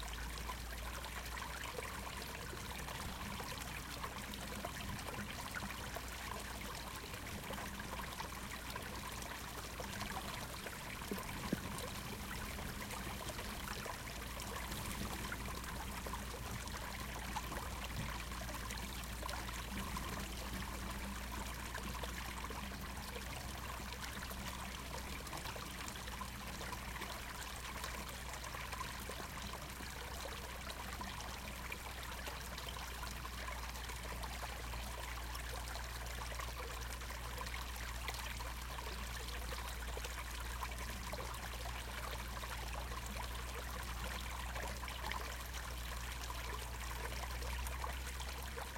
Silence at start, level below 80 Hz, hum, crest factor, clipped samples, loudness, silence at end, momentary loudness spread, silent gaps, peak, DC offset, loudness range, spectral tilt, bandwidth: 0 s; -50 dBFS; none; 22 dB; under 0.1%; -45 LUFS; 0 s; 2 LU; none; -24 dBFS; under 0.1%; 1 LU; -3.5 dB/octave; 17 kHz